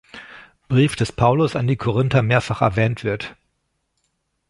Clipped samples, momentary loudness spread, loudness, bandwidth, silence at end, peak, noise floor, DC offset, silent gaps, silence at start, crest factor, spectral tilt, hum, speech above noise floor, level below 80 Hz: under 0.1%; 11 LU; -19 LUFS; 11.5 kHz; 1.2 s; -2 dBFS; -72 dBFS; under 0.1%; none; 0.15 s; 18 dB; -7 dB/octave; none; 53 dB; -46 dBFS